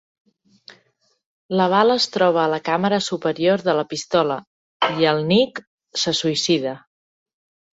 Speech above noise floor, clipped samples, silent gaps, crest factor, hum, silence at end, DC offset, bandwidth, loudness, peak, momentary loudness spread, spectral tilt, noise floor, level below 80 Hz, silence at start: 45 dB; under 0.1%; 4.47-4.80 s, 5.67-5.78 s; 18 dB; none; 0.95 s; under 0.1%; 8 kHz; -20 LUFS; -2 dBFS; 8 LU; -4.5 dB/octave; -64 dBFS; -64 dBFS; 1.5 s